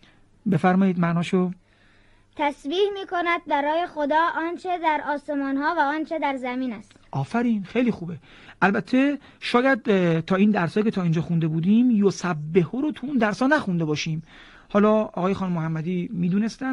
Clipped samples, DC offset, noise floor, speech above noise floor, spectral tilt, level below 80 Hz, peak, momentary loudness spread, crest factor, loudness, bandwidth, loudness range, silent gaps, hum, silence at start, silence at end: under 0.1%; under 0.1%; -56 dBFS; 34 dB; -7 dB/octave; -58 dBFS; -4 dBFS; 8 LU; 18 dB; -23 LUFS; 11 kHz; 4 LU; none; none; 0.45 s; 0 s